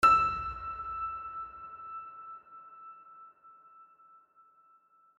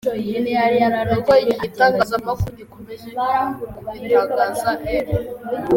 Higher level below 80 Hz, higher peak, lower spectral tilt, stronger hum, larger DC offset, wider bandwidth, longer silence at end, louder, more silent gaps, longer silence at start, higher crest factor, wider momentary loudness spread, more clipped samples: second, -58 dBFS vs -42 dBFS; second, -12 dBFS vs -2 dBFS; second, -3.5 dB/octave vs -6 dB/octave; neither; neither; second, 11.5 kHz vs 17 kHz; first, 1.35 s vs 0 s; second, -33 LUFS vs -19 LUFS; neither; about the same, 0 s vs 0.05 s; about the same, 22 dB vs 18 dB; first, 24 LU vs 15 LU; neither